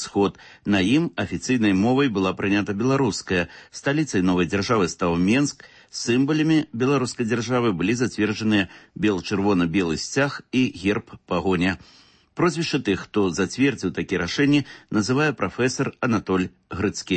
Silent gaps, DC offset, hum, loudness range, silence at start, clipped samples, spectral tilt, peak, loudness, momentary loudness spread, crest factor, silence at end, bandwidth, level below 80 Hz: none; under 0.1%; none; 2 LU; 0 s; under 0.1%; -5.5 dB/octave; -8 dBFS; -22 LUFS; 7 LU; 14 dB; 0 s; 8.8 kHz; -52 dBFS